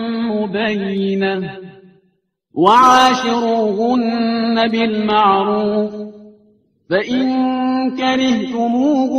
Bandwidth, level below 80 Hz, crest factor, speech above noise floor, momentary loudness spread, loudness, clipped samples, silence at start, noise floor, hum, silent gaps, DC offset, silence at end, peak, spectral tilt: 11 kHz; -56 dBFS; 16 dB; 49 dB; 9 LU; -15 LUFS; under 0.1%; 0 s; -63 dBFS; none; none; under 0.1%; 0 s; 0 dBFS; -5 dB/octave